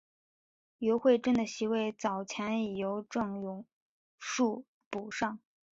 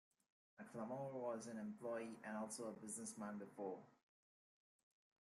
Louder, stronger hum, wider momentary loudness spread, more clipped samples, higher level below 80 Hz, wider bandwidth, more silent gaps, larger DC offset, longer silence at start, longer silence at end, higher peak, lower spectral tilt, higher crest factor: first, -33 LUFS vs -50 LUFS; neither; first, 15 LU vs 4 LU; neither; first, -72 dBFS vs under -90 dBFS; second, 8 kHz vs 13.5 kHz; first, 3.73-4.18 s, 4.68-4.91 s vs none; neither; first, 0.8 s vs 0.6 s; second, 0.4 s vs 1.3 s; first, -14 dBFS vs -36 dBFS; about the same, -5 dB/octave vs -5 dB/octave; about the same, 20 dB vs 16 dB